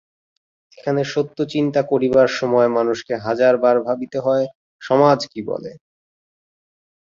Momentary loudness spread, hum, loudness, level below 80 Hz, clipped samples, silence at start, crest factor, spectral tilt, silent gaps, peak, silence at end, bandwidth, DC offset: 13 LU; none; -18 LUFS; -60 dBFS; under 0.1%; 0.8 s; 18 dB; -6 dB/octave; 4.55-4.79 s; -2 dBFS; 1.25 s; 7.6 kHz; under 0.1%